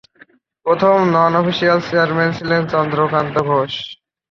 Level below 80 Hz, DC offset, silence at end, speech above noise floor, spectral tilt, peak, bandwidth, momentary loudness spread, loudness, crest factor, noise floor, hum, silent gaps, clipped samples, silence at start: -54 dBFS; under 0.1%; 0.35 s; 34 dB; -7 dB/octave; -2 dBFS; 7.2 kHz; 8 LU; -16 LUFS; 14 dB; -50 dBFS; none; none; under 0.1%; 0.65 s